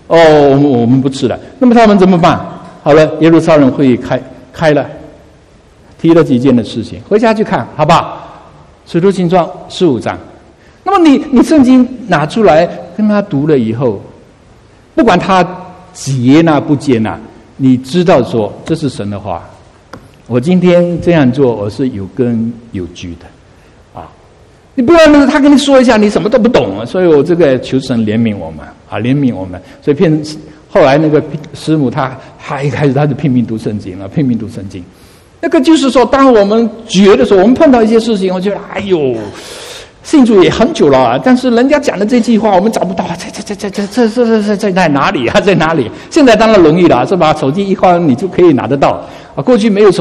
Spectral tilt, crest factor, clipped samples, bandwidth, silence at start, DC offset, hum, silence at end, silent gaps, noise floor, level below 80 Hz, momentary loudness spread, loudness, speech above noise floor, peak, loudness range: -6.5 dB/octave; 10 dB; 0.9%; 12 kHz; 0.1 s; under 0.1%; none; 0 s; none; -41 dBFS; -38 dBFS; 15 LU; -9 LUFS; 33 dB; 0 dBFS; 5 LU